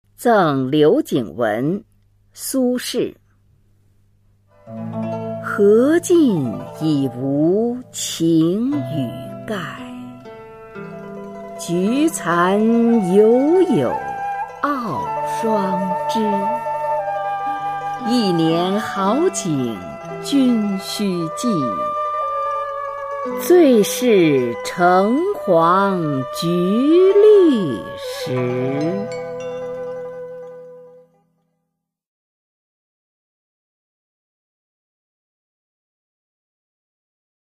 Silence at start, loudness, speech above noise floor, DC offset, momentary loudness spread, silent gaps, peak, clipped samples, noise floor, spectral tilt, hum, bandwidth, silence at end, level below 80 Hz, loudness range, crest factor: 0.2 s; -18 LUFS; 60 dB; under 0.1%; 16 LU; none; -2 dBFS; under 0.1%; -77 dBFS; -5.5 dB/octave; none; 15.5 kHz; 6.55 s; -58 dBFS; 10 LU; 16 dB